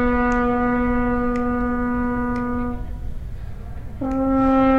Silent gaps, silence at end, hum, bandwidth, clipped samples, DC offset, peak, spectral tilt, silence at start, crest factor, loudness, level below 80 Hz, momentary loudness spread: none; 0 s; none; 7.4 kHz; under 0.1%; 1%; -8 dBFS; -8.5 dB/octave; 0 s; 14 dB; -21 LUFS; -30 dBFS; 16 LU